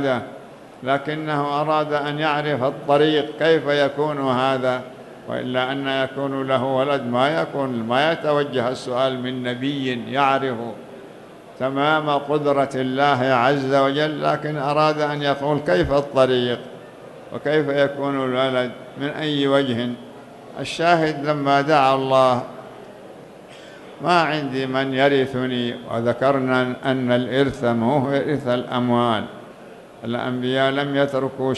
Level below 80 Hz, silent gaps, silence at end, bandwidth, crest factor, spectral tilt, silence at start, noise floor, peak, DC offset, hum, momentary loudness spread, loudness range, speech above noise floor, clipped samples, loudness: -54 dBFS; none; 0 s; 12 kHz; 18 dB; -6 dB/octave; 0 s; -42 dBFS; -2 dBFS; under 0.1%; none; 17 LU; 3 LU; 21 dB; under 0.1%; -20 LUFS